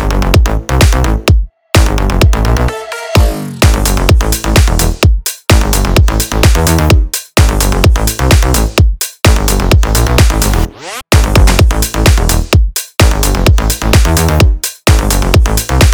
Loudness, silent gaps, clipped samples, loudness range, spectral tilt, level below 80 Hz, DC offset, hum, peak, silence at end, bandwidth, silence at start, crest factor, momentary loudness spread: -10 LUFS; none; 1%; 1 LU; -4.5 dB/octave; -12 dBFS; 0.4%; none; 0 dBFS; 0 s; over 20 kHz; 0 s; 8 dB; 4 LU